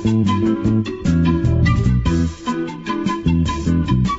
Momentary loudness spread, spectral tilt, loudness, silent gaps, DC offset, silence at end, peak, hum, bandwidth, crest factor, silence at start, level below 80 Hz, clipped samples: 7 LU; -7 dB/octave; -18 LUFS; none; under 0.1%; 0 s; -4 dBFS; none; 8 kHz; 12 dB; 0 s; -26 dBFS; under 0.1%